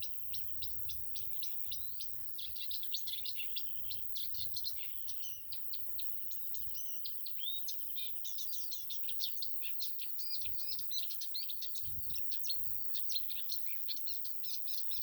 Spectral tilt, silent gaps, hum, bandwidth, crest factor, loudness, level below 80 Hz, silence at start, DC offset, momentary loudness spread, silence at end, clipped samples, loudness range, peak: 0.5 dB/octave; none; none; over 20 kHz; 18 dB; -34 LUFS; -70 dBFS; 0 s; under 0.1%; 4 LU; 0 s; under 0.1%; 2 LU; -18 dBFS